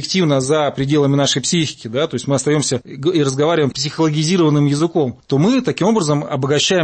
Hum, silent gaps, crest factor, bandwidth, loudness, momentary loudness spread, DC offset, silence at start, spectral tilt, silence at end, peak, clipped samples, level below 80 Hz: none; none; 12 dB; 8.8 kHz; -16 LUFS; 5 LU; under 0.1%; 0 s; -5 dB/octave; 0 s; -4 dBFS; under 0.1%; -54 dBFS